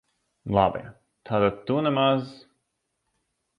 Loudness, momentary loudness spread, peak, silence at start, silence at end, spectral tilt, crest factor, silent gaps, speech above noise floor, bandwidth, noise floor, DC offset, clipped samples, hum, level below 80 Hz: -24 LUFS; 16 LU; -6 dBFS; 0.45 s; 1.25 s; -8.5 dB/octave; 22 dB; none; 54 dB; 9.6 kHz; -78 dBFS; under 0.1%; under 0.1%; none; -54 dBFS